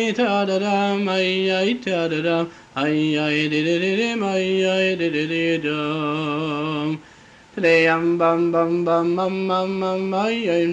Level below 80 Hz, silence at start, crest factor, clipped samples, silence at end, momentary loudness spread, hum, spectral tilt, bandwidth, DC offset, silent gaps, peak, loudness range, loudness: -62 dBFS; 0 s; 16 dB; under 0.1%; 0 s; 6 LU; none; -5.5 dB/octave; 8.6 kHz; under 0.1%; none; -6 dBFS; 2 LU; -20 LUFS